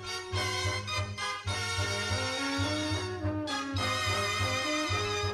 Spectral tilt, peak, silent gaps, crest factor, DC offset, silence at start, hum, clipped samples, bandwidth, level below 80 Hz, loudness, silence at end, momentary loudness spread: -3.5 dB/octave; -18 dBFS; none; 14 dB; under 0.1%; 0 s; none; under 0.1%; 14.5 kHz; -52 dBFS; -31 LUFS; 0 s; 5 LU